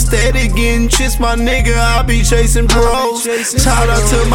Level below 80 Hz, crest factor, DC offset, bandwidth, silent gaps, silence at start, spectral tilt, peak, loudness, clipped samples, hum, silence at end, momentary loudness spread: -14 dBFS; 10 dB; under 0.1%; 16.5 kHz; none; 0 s; -4 dB/octave; 0 dBFS; -12 LUFS; under 0.1%; none; 0 s; 3 LU